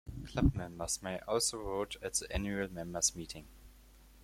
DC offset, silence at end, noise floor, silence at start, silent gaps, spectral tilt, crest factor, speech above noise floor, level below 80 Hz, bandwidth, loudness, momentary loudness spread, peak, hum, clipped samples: under 0.1%; 0 s; -59 dBFS; 0.05 s; none; -3.5 dB/octave; 20 dB; 23 dB; -46 dBFS; 16.5 kHz; -35 LUFS; 9 LU; -16 dBFS; none; under 0.1%